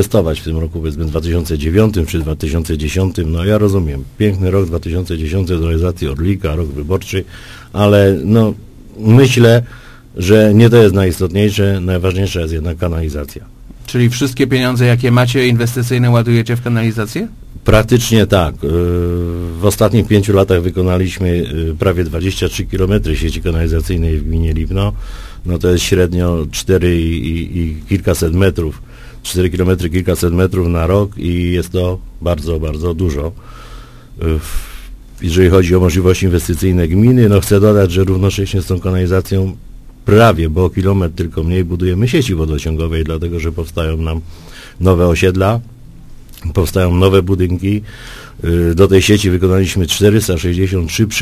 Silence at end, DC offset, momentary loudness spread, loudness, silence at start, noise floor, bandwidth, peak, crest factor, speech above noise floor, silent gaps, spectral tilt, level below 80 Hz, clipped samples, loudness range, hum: 0 s; under 0.1%; 11 LU; -14 LUFS; 0 s; -33 dBFS; 15.5 kHz; 0 dBFS; 12 dB; 21 dB; none; -6.5 dB/octave; -22 dBFS; 0.2%; 5 LU; none